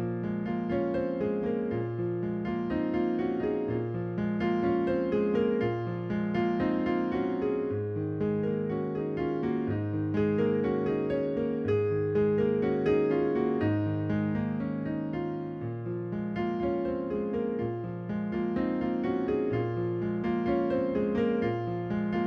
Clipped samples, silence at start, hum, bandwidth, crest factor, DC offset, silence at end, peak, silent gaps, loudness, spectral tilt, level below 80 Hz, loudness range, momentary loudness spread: under 0.1%; 0 s; none; 6.2 kHz; 14 dB; under 0.1%; 0 s; -14 dBFS; none; -30 LUFS; -10 dB/octave; -54 dBFS; 4 LU; 6 LU